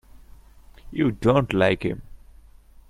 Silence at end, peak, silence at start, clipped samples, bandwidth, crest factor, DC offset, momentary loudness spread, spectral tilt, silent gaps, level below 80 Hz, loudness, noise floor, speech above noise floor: 0.75 s; -4 dBFS; 0.15 s; under 0.1%; 14 kHz; 22 dB; under 0.1%; 14 LU; -7.5 dB/octave; none; -46 dBFS; -22 LUFS; -49 dBFS; 28 dB